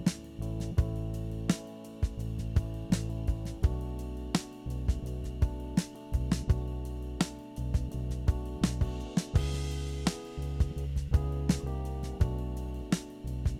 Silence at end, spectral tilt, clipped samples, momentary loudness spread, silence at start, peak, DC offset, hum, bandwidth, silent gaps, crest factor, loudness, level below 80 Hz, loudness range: 0 s; -6 dB/octave; under 0.1%; 7 LU; 0 s; -12 dBFS; under 0.1%; none; 15 kHz; none; 20 dB; -34 LUFS; -36 dBFS; 2 LU